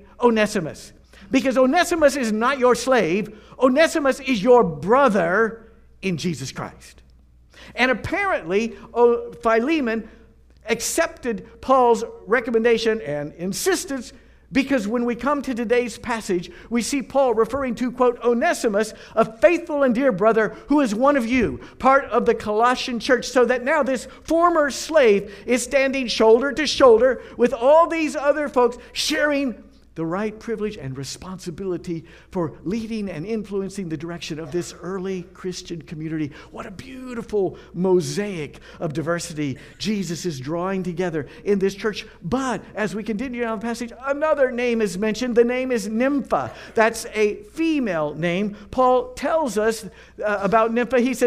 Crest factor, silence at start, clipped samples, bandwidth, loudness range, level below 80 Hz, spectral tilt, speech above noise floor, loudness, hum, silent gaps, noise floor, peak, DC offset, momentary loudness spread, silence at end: 20 dB; 0.2 s; under 0.1%; 15.5 kHz; 10 LU; -50 dBFS; -4.5 dB/octave; 31 dB; -21 LUFS; none; none; -51 dBFS; -2 dBFS; under 0.1%; 13 LU; 0 s